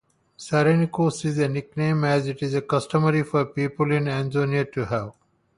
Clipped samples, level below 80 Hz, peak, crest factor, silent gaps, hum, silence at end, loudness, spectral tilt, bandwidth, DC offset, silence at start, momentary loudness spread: under 0.1%; -58 dBFS; -8 dBFS; 16 dB; none; none; 0.45 s; -23 LUFS; -7 dB/octave; 11 kHz; under 0.1%; 0.4 s; 6 LU